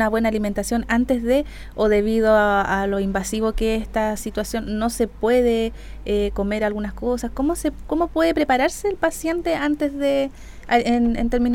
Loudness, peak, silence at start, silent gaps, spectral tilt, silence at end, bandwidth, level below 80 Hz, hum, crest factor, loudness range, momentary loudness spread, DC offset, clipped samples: -21 LUFS; -4 dBFS; 0 s; none; -5 dB/octave; 0 s; 17.5 kHz; -34 dBFS; none; 18 dB; 3 LU; 7 LU; under 0.1%; under 0.1%